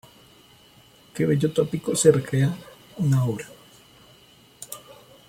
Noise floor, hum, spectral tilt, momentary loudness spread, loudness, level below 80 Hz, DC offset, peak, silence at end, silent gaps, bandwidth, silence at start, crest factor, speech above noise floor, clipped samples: -53 dBFS; none; -6 dB/octave; 22 LU; -23 LUFS; -60 dBFS; under 0.1%; -4 dBFS; 0.5 s; none; 16.5 kHz; 1.15 s; 22 dB; 32 dB; under 0.1%